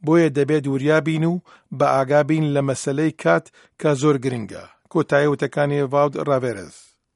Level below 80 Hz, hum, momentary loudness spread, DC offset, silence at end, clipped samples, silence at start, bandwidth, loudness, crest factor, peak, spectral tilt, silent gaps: -62 dBFS; none; 10 LU; under 0.1%; 0.45 s; under 0.1%; 0.05 s; 11.5 kHz; -20 LUFS; 18 dB; -2 dBFS; -6.5 dB/octave; none